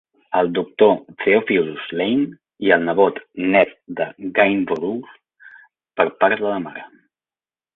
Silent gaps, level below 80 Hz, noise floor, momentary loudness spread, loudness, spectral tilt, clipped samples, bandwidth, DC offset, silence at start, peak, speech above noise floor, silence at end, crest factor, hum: none; -62 dBFS; under -90 dBFS; 11 LU; -19 LUFS; -8.5 dB/octave; under 0.1%; 4.1 kHz; under 0.1%; 0.3 s; -2 dBFS; over 71 dB; 0.9 s; 18 dB; none